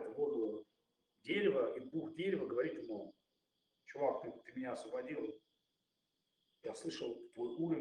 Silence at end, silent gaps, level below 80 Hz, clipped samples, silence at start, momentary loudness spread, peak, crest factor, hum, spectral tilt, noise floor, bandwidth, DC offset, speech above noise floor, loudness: 0 s; none; -84 dBFS; under 0.1%; 0 s; 13 LU; -22 dBFS; 20 dB; none; -6 dB/octave; -87 dBFS; 10.5 kHz; under 0.1%; 46 dB; -41 LUFS